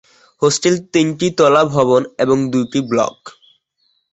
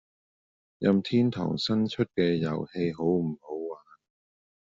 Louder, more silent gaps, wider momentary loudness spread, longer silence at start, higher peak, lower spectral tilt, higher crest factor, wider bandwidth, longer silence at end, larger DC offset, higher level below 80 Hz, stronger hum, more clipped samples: first, -15 LUFS vs -28 LUFS; neither; second, 6 LU vs 11 LU; second, 0.4 s vs 0.8 s; first, 0 dBFS vs -10 dBFS; about the same, -5 dB/octave vs -6 dB/octave; about the same, 16 dB vs 20 dB; about the same, 8.2 kHz vs 7.8 kHz; about the same, 0.8 s vs 0.85 s; neither; first, -56 dBFS vs -64 dBFS; neither; neither